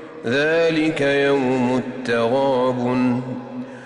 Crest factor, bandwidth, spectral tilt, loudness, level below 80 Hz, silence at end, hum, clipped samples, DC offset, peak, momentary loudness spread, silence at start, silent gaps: 10 dB; 11 kHz; -6 dB/octave; -19 LUFS; -56 dBFS; 0 s; none; under 0.1%; under 0.1%; -10 dBFS; 7 LU; 0 s; none